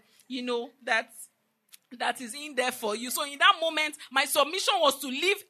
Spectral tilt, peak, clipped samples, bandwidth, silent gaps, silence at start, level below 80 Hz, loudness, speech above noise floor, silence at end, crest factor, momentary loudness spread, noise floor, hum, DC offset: 0 dB/octave; -6 dBFS; under 0.1%; 13.5 kHz; none; 0.3 s; under -90 dBFS; -27 LUFS; 32 dB; 0.1 s; 22 dB; 13 LU; -60 dBFS; none; under 0.1%